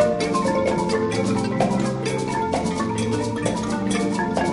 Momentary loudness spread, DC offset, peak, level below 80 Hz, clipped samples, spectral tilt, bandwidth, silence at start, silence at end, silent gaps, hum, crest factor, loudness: 3 LU; under 0.1%; -6 dBFS; -44 dBFS; under 0.1%; -5.5 dB/octave; 11.5 kHz; 0 s; 0 s; none; none; 16 dB; -22 LUFS